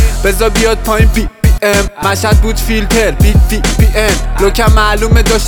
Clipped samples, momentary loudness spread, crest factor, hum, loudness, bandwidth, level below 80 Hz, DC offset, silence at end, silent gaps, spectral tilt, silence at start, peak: under 0.1%; 4 LU; 8 dB; none; -11 LUFS; 19.5 kHz; -12 dBFS; under 0.1%; 0 s; none; -5 dB/octave; 0 s; 0 dBFS